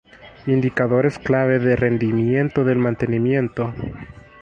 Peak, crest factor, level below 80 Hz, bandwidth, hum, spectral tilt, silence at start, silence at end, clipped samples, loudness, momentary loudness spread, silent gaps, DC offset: -4 dBFS; 16 dB; -46 dBFS; 8.4 kHz; none; -9 dB/octave; 0.2 s; 0.3 s; under 0.1%; -19 LUFS; 10 LU; none; under 0.1%